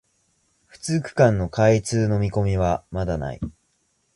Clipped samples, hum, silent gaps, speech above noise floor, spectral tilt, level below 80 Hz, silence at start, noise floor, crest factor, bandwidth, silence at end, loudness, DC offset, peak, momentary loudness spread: under 0.1%; none; none; 47 dB; -6.5 dB/octave; -40 dBFS; 0.85 s; -68 dBFS; 18 dB; 11.5 kHz; 0.65 s; -22 LUFS; under 0.1%; -4 dBFS; 13 LU